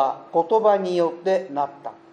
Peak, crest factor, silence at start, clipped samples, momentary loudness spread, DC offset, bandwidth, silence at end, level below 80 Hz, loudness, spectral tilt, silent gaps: -6 dBFS; 16 dB; 0 s; under 0.1%; 10 LU; under 0.1%; 9.2 kHz; 0.2 s; -78 dBFS; -22 LUFS; -6.5 dB/octave; none